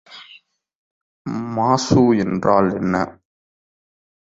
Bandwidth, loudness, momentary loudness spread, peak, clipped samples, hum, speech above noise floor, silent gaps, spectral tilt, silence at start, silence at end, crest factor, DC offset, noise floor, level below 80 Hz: 7.8 kHz; -18 LUFS; 14 LU; -2 dBFS; under 0.1%; none; 33 dB; 0.75-1.25 s; -6.5 dB/octave; 0.1 s; 1.1 s; 18 dB; under 0.1%; -49 dBFS; -50 dBFS